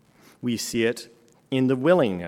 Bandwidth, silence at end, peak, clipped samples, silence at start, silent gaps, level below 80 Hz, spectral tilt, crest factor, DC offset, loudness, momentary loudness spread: 17 kHz; 0 s; -6 dBFS; under 0.1%; 0.45 s; none; -64 dBFS; -5.5 dB/octave; 18 dB; under 0.1%; -24 LUFS; 12 LU